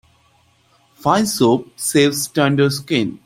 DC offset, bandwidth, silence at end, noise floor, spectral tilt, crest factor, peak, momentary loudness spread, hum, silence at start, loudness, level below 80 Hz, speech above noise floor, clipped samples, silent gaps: under 0.1%; 16.5 kHz; 0.1 s; -57 dBFS; -4.5 dB/octave; 16 dB; -2 dBFS; 4 LU; none; 1.05 s; -17 LUFS; -56 dBFS; 40 dB; under 0.1%; none